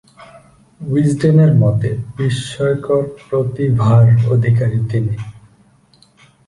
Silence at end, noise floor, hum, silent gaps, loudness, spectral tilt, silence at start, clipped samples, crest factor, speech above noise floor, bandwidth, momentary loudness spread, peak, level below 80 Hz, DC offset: 1.1 s; -51 dBFS; none; none; -15 LUFS; -8 dB/octave; 0.35 s; under 0.1%; 14 dB; 38 dB; 11 kHz; 10 LU; -2 dBFS; -44 dBFS; under 0.1%